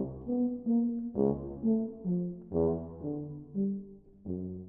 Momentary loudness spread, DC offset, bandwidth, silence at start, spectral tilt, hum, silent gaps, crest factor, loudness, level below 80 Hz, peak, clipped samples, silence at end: 10 LU; under 0.1%; 1.6 kHz; 0 s; -15.5 dB/octave; none; none; 18 dB; -33 LUFS; -56 dBFS; -14 dBFS; under 0.1%; 0 s